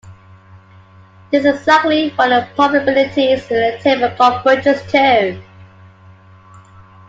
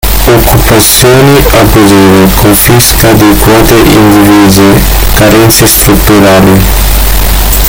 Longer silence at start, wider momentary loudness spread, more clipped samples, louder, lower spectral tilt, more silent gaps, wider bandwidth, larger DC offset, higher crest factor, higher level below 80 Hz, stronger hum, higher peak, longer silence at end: about the same, 0.05 s vs 0.05 s; about the same, 4 LU vs 4 LU; second, under 0.1% vs 20%; second, -14 LUFS vs -3 LUFS; about the same, -5 dB/octave vs -4.5 dB/octave; neither; second, 7.8 kHz vs over 20 kHz; neither; first, 16 dB vs 2 dB; second, -56 dBFS vs -10 dBFS; neither; about the same, 0 dBFS vs 0 dBFS; first, 1.45 s vs 0 s